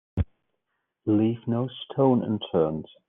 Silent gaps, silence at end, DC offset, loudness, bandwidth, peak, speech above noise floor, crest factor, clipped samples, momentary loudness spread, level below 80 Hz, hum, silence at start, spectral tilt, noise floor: none; 0.25 s; under 0.1%; -26 LUFS; 3.8 kHz; -10 dBFS; 55 dB; 16 dB; under 0.1%; 9 LU; -44 dBFS; none; 0.15 s; -7.5 dB/octave; -79 dBFS